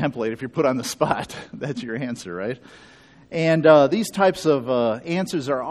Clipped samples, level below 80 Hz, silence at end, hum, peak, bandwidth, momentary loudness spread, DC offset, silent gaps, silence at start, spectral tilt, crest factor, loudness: under 0.1%; -58 dBFS; 0 s; none; 0 dBFS; 13 kHz; 15 LU; under 0.1%; none; 0 s; -5.5 dB/octave; 22 dB; -21 LUFS